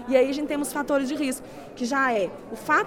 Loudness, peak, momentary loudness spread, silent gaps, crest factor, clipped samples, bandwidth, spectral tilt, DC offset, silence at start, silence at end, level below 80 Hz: -26 LUFS; -6 dBFS; 12 LU; none; 18 dB; under 0.1%; 17.5 kHz; -3.5 dB/octave; under 0.1%; 0 s; 0 s; -56 dBFS